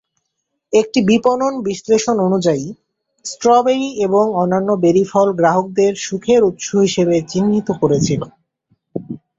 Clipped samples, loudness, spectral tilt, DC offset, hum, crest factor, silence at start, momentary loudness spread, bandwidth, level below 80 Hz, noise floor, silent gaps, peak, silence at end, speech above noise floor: under 0.1%; -15 LUFS; -5.5 dB/octave; under 0.1%; none; 14 dB; 0.7 s; 9 LU; 7.8 kHz; -54 dBFS; -74 dBFS; none; -2 dBFS; 0.2 s; 59 dB